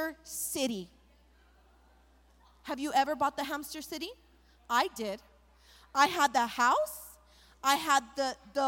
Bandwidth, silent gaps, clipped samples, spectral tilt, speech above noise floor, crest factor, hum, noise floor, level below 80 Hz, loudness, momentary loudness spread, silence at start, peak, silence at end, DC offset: 17 kHz; none; under 0.1%; -1.5 dB/octave; 32 dB; 22 dB; none; -63 dBFS; -64 dBFS; -31 LUFS; 15 LU; 0 s; -10 dBFS; 0 s; under 0.1%